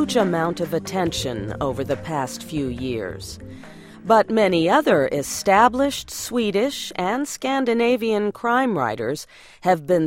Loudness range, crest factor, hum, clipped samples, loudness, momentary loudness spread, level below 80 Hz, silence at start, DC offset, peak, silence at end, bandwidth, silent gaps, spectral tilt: 6 LU; 18 dB; none; under 0.1%; -21 LUFS; 11 LU; -48 dBFS; 0 s; under 0.1%; -2 dBFS; 0 s; 16.5 kHz; none; -4.5 dB/octave